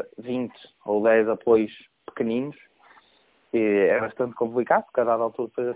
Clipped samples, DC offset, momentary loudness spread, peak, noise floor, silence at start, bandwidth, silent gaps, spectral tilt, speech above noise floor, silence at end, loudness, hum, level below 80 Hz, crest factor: under 0.1%; under 0.1%; 13 LU; -6 dBFS; -62 dBFS; 0 s; 4 kHz; none; -10 dB/octave; 38 dB; 0 s; -24 LUFS; none; -66 dBFS; 18 dB